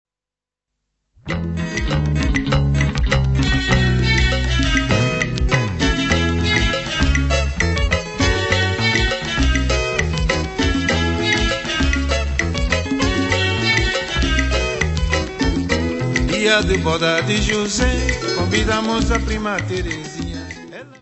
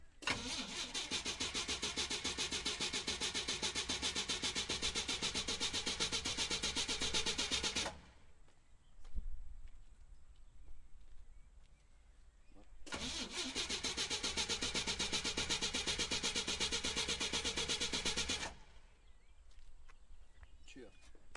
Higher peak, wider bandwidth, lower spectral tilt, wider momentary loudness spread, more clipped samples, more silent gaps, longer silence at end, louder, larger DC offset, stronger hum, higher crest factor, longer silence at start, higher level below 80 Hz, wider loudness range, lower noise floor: first, -2 dBFS vs -22 dBFS; second, 8.4 kHz vs 11.5 kHz; first, -4.5 dB/octave vs -1 dB/octave; second, 5 LU vs 8 LU; neither; neither; about the same, 0.05 s vs 0 s; first, -18 LUFS vs -38 LUFS; neither; neither; about the same, 16 dB vs 20 dB; first, 1.25 s vs 0 s; first, -24 dBFS vs -56 dBFS; second, 2 LU vs 8 LU; first, -88 dBFS vs -62 dBFS